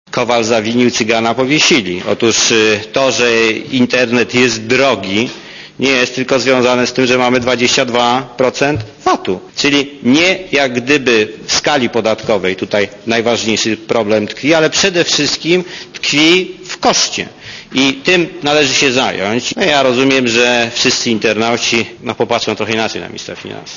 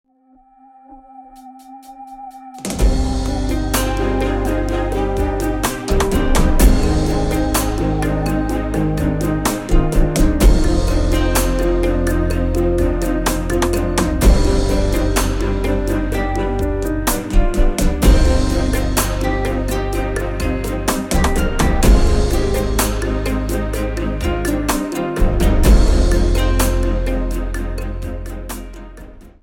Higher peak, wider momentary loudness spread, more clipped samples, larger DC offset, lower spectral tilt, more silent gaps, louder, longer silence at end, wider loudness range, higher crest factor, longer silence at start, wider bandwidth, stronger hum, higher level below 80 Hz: about the same, 0 dBFS vs -2 dBFS; about the same, 7 LU vs 8 LU; neither; neither; second, -3 dB/octave vs -5.5 dB/octave; neither; first, -12 LUFS vs -18 LUFS; second, 0 s vs 0.15 s; about the same, 2 LU vs 3 LU; about the same, 14 dB vs 14 dB; second, 0.15 s vs 0.9 s; second, 7.4 kHz vs 17.5 kHz; neither; second, -48 dBFS vs -18 dBFS